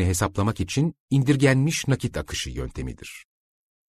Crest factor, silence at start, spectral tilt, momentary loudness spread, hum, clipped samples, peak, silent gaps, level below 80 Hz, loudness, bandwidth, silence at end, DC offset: 18 dB; 0 s; -5.5 dB/octave; 16 LU; none; under 0.1%; -6 dBFS; 1.00-1.08 s; -42 dBFS; -24 LUFS; 13.5 kHz; 0.65 s; under 0.1%